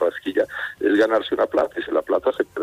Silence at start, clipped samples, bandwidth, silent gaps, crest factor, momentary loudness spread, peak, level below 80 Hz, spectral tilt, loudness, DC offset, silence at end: 0 s; under 0.1%; 15 kHz; none; 14 dB; 6 LU; -8 dBFS; -60 dBFS; -5 dB/octave; -21 LUFS; under 0.1%; 0 s